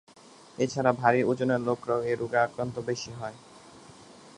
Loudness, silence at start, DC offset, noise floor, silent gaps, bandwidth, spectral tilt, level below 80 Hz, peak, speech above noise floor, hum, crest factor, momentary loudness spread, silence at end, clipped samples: -28 LUFS; 0.6 s; under 0.1%; -51 dBFS; none; 11 kHz; -6 dB/octave; -66 dBFS; -6 dBFS; 23 dB; none; 24 dB; 14 LU; 0.05 s; under 0.1%